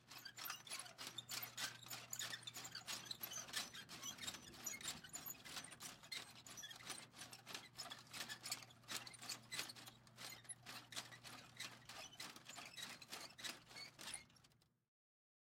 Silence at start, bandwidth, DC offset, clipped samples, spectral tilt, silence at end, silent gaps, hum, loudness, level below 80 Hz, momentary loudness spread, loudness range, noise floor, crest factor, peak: 0 s; 16.5 kHz; under 0.1%; under 0.1%; -0.5 dB/octave; 0.9 s; none; none; -51 LUFS; -84 dBFS; 7 LU; 5 LU; -75 dBFS; 26 dB; -30 dBFS